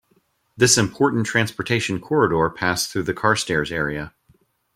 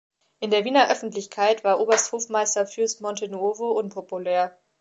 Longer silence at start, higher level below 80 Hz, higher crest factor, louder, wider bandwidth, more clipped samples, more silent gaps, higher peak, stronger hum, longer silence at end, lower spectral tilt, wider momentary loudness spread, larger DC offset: first, 0.55 s vs 0.4 s; first, -50 dBFS vs -82 dBFS; about the same, 20 dB vs 20 dB; first, -20 LUFS vs -23 LUFS; first, 16.5 kHz vs 9.2 kHz; neither; neither; first, 0 dBFS vs -4 dBFS; neither; first, 0.7 s vs 0.3 s; first, -3.5 dB/octave vs -2 dB/octave; about the same, 8 LU vs 10 LU; neither